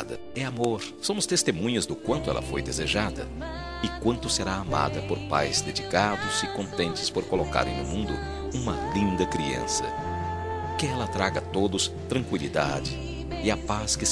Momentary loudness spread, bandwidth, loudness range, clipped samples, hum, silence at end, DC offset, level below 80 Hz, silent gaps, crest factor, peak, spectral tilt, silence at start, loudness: 7 LU; 13.5 kHz; 2 LU; under 0.1%; none; 0 s; 0.2%; -42 dBFS; none; 22 dB; -6 dBFS; -4 dB/octave; 0 s; -28 LUFS